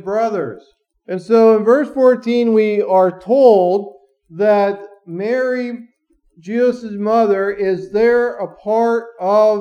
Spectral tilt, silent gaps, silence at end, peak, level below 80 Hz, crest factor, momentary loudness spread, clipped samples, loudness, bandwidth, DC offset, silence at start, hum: -7 dB/octave; none; 0 s; 0 dBFS; -60 dBFS; 14 dB; 14 LU; under 0.1%; -15 LUFS; 8.4 kHz; under 0.1%; 0.05 s; none